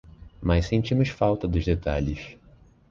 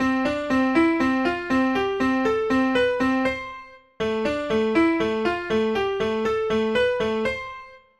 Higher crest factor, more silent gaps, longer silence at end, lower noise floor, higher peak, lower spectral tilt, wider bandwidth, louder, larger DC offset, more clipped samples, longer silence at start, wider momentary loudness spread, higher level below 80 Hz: about the same, 18 dB vs 16 dB; neither; first, 0.55 s vs 0.2 s; first, -54 dBFS vs -42 dBFS; about the same, -8 dBFS vs -8 dBFS; first, -7.5 dB/octave vs -5.5 dB/octave; second, 7.4 kHz vs 11 kHz; second, -25 LUFS vs -22 LUFS; neither; neither; about the same, 0.05 s vs 0 s; about the same, 9 LU vs 7 LU; first, -34 dBFS vs -48 dBFS